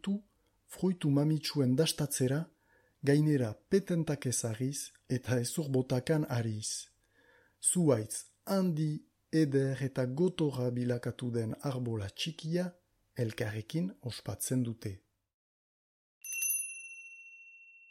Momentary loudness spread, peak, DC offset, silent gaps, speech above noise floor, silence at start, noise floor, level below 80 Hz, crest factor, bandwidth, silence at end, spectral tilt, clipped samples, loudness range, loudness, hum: 14 LU; -14 dBFS; under 0.1%; 15.34-16.21 s; 37 dB; 0.05 s; -70 dBFS; -68 dBFS; 18 dB; 16 kHz; 0.25 s; -5.5 dB/octave; under 0.1%; 6 LU; -33 LUFS; none